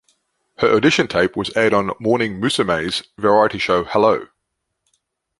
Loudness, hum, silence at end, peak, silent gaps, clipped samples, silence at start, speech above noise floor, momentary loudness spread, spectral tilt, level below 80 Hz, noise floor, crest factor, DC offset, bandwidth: -17 LUFS; none; 1.15 s; -2 dBFS; none; under 0.1%; 0.6 s; 59 dB; 5 LU; -5 dB/octave; -50 dBFS; -76 dBFS; 18 dB; under 0.1%; 11.5 kHz